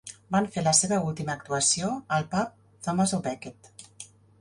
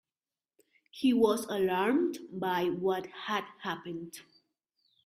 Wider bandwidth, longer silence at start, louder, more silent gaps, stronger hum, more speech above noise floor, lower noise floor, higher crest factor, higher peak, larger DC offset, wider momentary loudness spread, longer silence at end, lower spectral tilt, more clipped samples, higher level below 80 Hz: second, 11.5 kHz vs 15.5 kHz; second, 0.05 s vs 0.95 s; first, -26 LUFS vs -31 LUFS; neither; neither; second, 23 dB vs over 59 dB; second, -49 dBFS vs under -90 dBFS; about the same, 22 dB vs 18 dB; first, -6 dBFS vs -14 dBFS; neither; first, 22 LU vs 15 LU; second, 0.35 s vs 0.85 s; second, -3.5 dB/octave vs -5 dB/octave; neither; first, -62 dBFS vs -74 dBFS